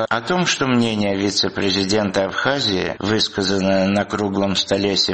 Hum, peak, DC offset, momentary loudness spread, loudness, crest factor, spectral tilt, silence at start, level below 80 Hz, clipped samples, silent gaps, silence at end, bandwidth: none; -2 dBFS; 0.2%; 3 LU; -18 LUFS; 16 dB; -4 dB/octave; 0 s; -50 dBFS; under 0.1%; none; 0 s; 8.8 kHz